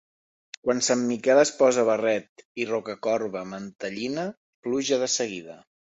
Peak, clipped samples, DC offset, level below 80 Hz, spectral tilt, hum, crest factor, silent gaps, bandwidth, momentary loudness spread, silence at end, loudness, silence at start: -6 dBFS; under 0.1%; under 0.1%; -70 dBFS; -3 dB/octave; none; 20 dB; 2.29-2.36 s, 2.45-2.55 s, 3.75-3.79 s, 4.37-4.63 s; 8.2 kHz; 15 LU; 0.3 s; -25 LUFS; 0.65 s